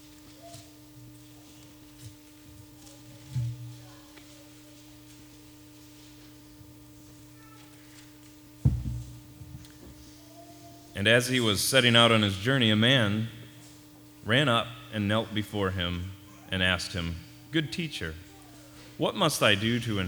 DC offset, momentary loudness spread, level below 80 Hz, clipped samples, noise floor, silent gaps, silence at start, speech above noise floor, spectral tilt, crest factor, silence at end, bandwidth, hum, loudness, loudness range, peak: under 0.1%; 27 LU; -50 dBFS; under 0.1%; -51 dBFS; none; 0.25 s; 26 dB; -4.5 dB/octave; 26 dB; 0 s; over 20 kHz; none; -26 LUFS; 19 LU; -6 dBFS